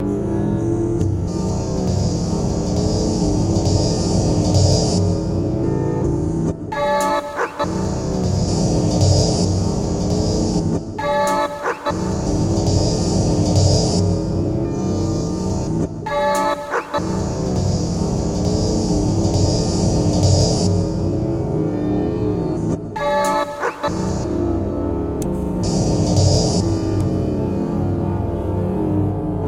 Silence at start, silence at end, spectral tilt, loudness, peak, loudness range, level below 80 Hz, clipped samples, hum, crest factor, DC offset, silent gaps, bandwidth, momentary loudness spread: 0 s; 0 s; -6 dB/octave; -19 LUFS; -4 dBFS; 3 LU; -30 dBFS; under 0.1%; none; 16 dB; under 0.1%; none; 13 kHz; 6 LU